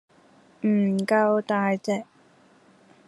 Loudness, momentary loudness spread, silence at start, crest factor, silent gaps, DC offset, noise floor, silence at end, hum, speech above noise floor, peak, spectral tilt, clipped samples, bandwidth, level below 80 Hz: -24 LUFS; 8 LU; 0.65 s; 18 dB; none; under 0.1%; -57 dBFS; 1.05 s; none; 34 dB; -8 dBFS; -7 dB/octave; under 0.1%; 12 kHz; -74 dBFS